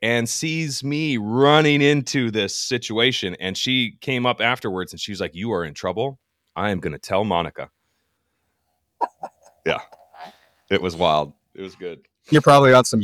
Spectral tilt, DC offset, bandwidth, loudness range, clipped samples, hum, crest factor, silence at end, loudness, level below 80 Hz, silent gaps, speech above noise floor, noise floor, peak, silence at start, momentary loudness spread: -4.5 dB/octave; under 0.1%; 15.5 kHz; 9 LU; under 0.1%; none; 18 dB; 0 s; -20 LUFS; -56 dBFS; none; 52 dB; -72 dBFS; -2 dBFS; 0 s; 19 LU